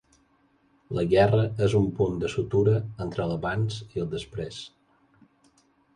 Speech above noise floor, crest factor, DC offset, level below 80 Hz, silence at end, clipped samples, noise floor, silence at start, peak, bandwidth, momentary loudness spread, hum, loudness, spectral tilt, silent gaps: 40 dB; 18 dB; under 0.1%; -50 dBFS; 1.3 s; under 0.1%; -65 dBFS; 0.9 s; -10 dBFS; 10.5 kHz; 14 LU; none; -26 LUFS; -7.5 dB/octave; none